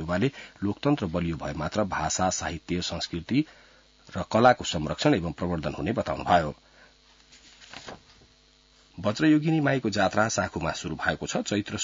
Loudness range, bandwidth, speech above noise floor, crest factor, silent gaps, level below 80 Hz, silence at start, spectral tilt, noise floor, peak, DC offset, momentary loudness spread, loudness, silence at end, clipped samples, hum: 5 LU; 7.8 kHz; 33 dB; 22 dB; none; -52 dBFS; 0 s; -5 dB/octave; -60 dBFS; -6 dBFS; under 0.1%; 12 LU; -27 LUFS; 0 s; under 0.1%; none